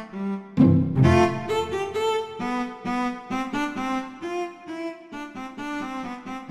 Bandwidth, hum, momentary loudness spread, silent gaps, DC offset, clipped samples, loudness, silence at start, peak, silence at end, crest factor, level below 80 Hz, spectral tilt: 13 kHz; none; 16 LU; none; under 0.1%; under 0.1%; -25 LUFS; 0 s; -6 dBFS; 0 s; 20 dB; -48 dBFS; -7 dB/octave